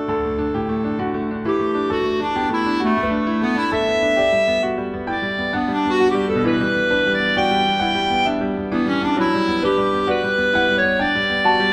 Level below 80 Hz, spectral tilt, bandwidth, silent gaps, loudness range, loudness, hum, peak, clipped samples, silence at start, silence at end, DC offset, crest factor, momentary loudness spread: -44 dBFS; -5.5 dB/octave; 11 kHz; none; 2 LU; -19 LUFS; none; -4 dBFS; under 0.1%; 0 s; 0 s; under 0.1%; 14 dB; 6 LU